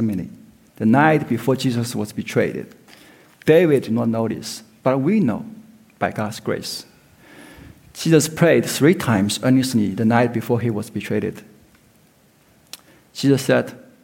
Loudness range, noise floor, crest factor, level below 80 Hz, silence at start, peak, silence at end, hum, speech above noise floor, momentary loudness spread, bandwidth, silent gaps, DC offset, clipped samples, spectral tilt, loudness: 6 LU; -55 dBFS; 18 dB; -58 dBFS; 0 s; -2 dBFS; 0.25 s; none; 37 dB; 17 LU; 17 kHz; none; under 0.1%; under 0.1%; -6 dB/octave; -19 LUFS